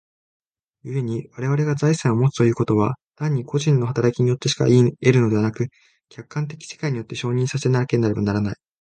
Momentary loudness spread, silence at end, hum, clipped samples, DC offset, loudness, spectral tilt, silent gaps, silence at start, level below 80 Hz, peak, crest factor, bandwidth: 12 LU; 0.25 s; none; under 0.1%; under 0.1%; -21 LUFS; -6.5 dB/octave; 3.03-3.11 s; 0.85 s; -54 dBFS; 0 dBFS; 20 dB; 9.2 kHz